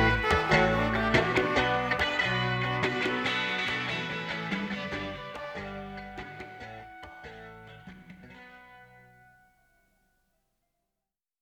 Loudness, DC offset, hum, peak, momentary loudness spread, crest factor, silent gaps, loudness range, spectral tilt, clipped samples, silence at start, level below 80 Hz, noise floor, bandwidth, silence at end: -28 LUFS; under 0.1%; none; -8 dBFS; 24 LU; 22 dB; none; 22 LU; -5.5 dB/octave; under 0.1%; 0 s; -46 dBFS; -89 dBFS; 16.5 kHz; 2.55 s